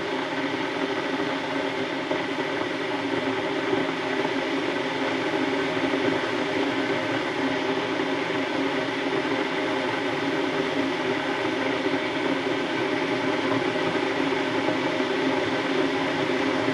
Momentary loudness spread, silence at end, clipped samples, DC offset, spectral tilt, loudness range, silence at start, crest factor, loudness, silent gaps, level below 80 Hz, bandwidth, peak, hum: 3 LU; 0 s; under 0.1%; under 0.1%; -4.5 dB/octave; 2 LU; 0 s; 16 dB; -25 LUFS; none; -62 dBFS; 12 kHz; -10 dBFS; none